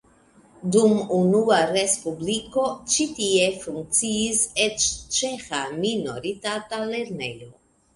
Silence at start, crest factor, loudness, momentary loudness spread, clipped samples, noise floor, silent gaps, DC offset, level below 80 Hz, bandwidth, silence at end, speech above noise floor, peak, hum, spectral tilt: 0.6 s; 18 dB; -23 LUFS; 10 LU; under 0.1%; -55 dBFS; none; under 0.1%; -56 dBFS; 11.5 kHz; 0.45 s; 32 dB; -4 dBFS; none; -3 dB/octave